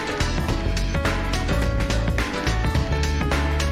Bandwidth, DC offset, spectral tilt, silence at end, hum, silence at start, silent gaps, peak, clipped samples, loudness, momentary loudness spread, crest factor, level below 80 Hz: 15 kHz; 0.3%; -5 dB/octave; 0 s; none; 0 s; none; -10 dBFS; under 0.1%; -23 LUFS; 2 LU; 12 dB; -26 dBFS